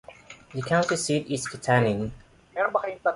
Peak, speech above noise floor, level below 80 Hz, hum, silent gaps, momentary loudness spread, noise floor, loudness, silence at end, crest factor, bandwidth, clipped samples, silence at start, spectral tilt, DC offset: -8 dBFS; 23 dB; -56 dBFS; none; none; 14 LU; -48 dBFS; -26 LUFS; 0 s; 18 dB; 11.5 kHz; under 0.1%; 0.1 s; -5 dB/octave; under 0.1%